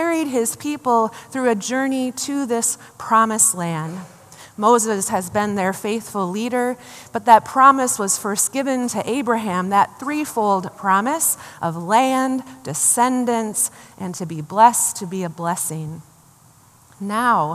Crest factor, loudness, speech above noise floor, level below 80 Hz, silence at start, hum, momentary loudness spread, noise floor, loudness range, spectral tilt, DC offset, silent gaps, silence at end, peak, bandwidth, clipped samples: 20 dB; -19 LUFS; 31 dB; -66 dBFS; 0 s; none; 13 LU; -51 dBFS; 4 LU; -3.5 dB/octave; under 0.1%; none; 0 s; 0 dBFS; 15 kHz; under 0.1%